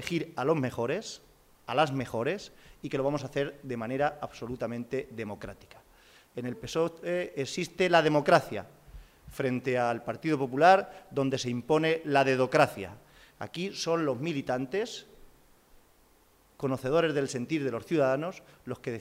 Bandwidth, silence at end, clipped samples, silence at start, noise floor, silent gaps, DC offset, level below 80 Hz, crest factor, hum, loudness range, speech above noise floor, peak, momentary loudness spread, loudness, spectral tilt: 16 kHz; 0 s; under 0.1%; 0 s; -63 dBFS; none; under 0.1%; -60 dBFS; 22 dB; none; 8 LU; 34 dB; -8 dBFS; 16 LU; -29 LUFS; -5.5 dB/octave